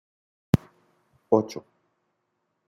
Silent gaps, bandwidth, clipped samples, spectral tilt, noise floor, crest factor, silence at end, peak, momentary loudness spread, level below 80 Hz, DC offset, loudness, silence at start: none; 16.5 kHz; under 0.1%; -8 dB/octave; -77 dBFS; 26 dB; 1.1 s; -4 dBFS; 13 LU; -54 dBFS; under 0.1%; -26 LUFS; 0.55 s